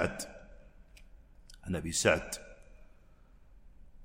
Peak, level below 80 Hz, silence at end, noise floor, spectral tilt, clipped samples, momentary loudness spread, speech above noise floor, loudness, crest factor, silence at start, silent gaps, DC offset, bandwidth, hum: -12 dBFS; -54 dBFS; 0 s; -58 dBFS; -3.5 dB/octave; under 0.1%; 24 LU; 26 dB; -33 LUFS; 26 dB; 0 s; none; under 0.1%; 16 kHz; none